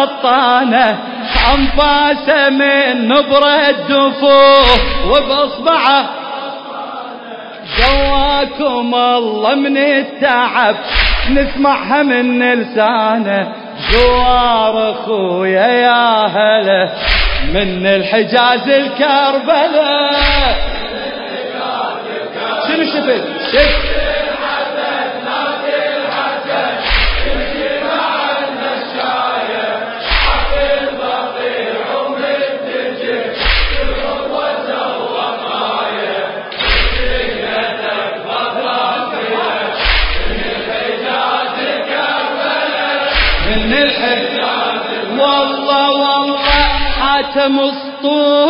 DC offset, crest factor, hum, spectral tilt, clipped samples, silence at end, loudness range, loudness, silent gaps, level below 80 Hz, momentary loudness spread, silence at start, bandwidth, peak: under 0.1%; 14 dB; none; -6.5 dB/octave; under 0.1%; 0 s; 6 LU; -13 LUFS; none; -26 dBFS; 8 LU; 0 s; 5.4 kHz; 0 dBFS